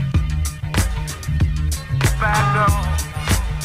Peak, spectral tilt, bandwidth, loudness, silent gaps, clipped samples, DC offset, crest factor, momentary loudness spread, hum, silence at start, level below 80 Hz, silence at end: -6 dBFS; -5 dB/octave; 16 kHz; -20 LUFS; none; under 0.1%; under 0.1%; 12 dB; 7 LU; none; 0 s; -24 dBFS; 0 s